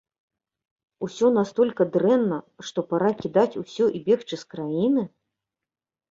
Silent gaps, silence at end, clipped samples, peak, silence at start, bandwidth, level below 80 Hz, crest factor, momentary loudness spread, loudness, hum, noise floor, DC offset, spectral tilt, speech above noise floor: none; 1.05 s; under 0.1%; -6 dBFS; 1 s; 7.8 kHz; -66 dBFS; 18 dB; 11 LU; -23 LUFS; none; -89 dBFS; under 0.1%; -6.5 dB/octave; 66 dB